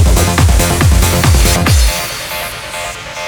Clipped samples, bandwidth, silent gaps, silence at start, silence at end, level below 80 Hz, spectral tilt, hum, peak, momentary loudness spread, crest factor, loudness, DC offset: under 0.1%; over 20 kHz; none; 0 s; 0 s; -14 dBFS; -4 dB/octave; none; 0 dBFS; 11 LU; 10 dB; -12 LUFS; under 0.1%